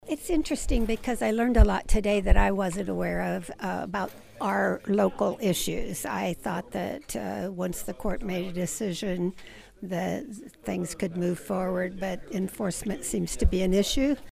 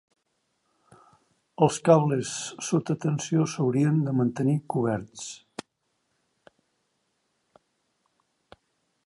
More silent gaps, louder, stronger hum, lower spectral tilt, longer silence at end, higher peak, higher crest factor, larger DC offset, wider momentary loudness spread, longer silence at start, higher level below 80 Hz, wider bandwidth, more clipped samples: neither; second, -29 LUFS vs -25 LUFS; neither; second, -5 dB/octave vs -6.5 dB/octave; second, 0 s vs 3.7 s; about the same, -6 dBFS vs -6 dBFS; about the same, 22 dB vs 24 dB; neither; second, 9 LU vs 17 LU; second, 0.05 s vs 1.6 s; first, -32 dBFS vs -68 dBFS; first, 15.5 kHz vs 11.5 kHz; neither